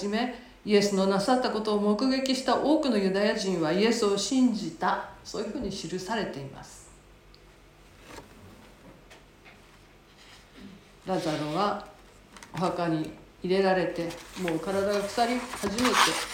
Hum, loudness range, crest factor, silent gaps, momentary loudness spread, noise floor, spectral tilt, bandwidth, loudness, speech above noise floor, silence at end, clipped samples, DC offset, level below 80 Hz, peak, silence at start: none; 13 LU; 24 dB; none; 18 LU; -55 dBFS; -4.5 dB/octave; 17 kHz; -27 LUFS; 28 dB; 0 s; under 0.1%; under 0.1%; -58 dBFS; -6 dBFS; 0 s